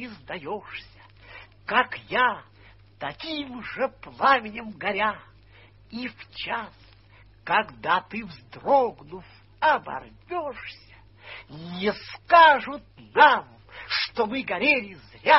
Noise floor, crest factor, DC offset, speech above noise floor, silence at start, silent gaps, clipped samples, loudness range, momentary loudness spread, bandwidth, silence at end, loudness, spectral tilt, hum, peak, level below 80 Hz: -53 dBFS; 24 dB; under 0.1%; 29 dB; 0 s; none; under 0.1%; 9 LU; 23 LU; 6 kHz; 0 s; -24 LUFS; -6.5 dB/octave; none; -2 dBFS; -58 dBFS